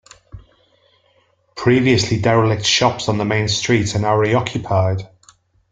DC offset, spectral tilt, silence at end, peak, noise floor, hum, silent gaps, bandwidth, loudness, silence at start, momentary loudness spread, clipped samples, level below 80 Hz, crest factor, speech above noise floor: under 0.1%; -5 dB/octave; 0.65 s; 0 dBFS; -59 dBFS; none; none; 9.4 kHz; -17 LUFS; 0.35 s; 6 LU; under 0.1%; -48 dBFS; 18 dB; 43 dB